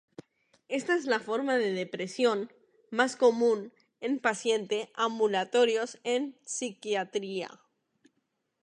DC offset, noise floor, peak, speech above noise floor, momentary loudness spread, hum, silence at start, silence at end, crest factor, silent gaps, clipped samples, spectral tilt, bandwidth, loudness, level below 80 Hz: under 0.1%; -79 dBFS; -8 dBFS; 50 dB; 10 LU; none; 0.7 s; 1.1 s; 22 dB; none; under 0.1%; -3.5 dB/octave; 10.5 kHz; -29 LUFS; -86 dBFS